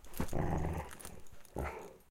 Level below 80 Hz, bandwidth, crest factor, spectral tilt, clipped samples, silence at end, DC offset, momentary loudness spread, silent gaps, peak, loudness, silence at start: -46 dBFS; 17 kHz; 18 dB; -6.5 dB/octave; under 0.1%; 0.1 s; under 0.1%; 14 LU; none; -20 dBFS; -41 LUFS; 0 s